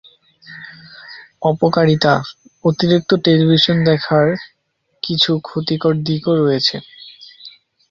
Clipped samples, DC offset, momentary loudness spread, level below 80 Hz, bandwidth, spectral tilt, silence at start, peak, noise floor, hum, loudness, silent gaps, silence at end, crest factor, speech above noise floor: under 0.1%; under 0.1%; 23 LU; -52 dBFS; 7.4 kHz; -6.5 dB/octave; 0.5 s; 0 dBFS; -67 dBFS; none; -15 LUFS; none; 0.4 s; 16 dB; 51 dB